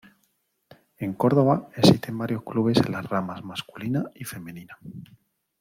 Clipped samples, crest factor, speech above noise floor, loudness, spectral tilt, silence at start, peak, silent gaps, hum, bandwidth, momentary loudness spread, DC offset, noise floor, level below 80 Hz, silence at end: under 0.1%; 22 dB; 47 dB; -24 LUFS; -6.5 dB/octave; 1 s; -4 dBFS; none; none; 16.5 kHz; 23 LU; under 0.1%; -71 dBFS; -60 dBFS; 0.6 s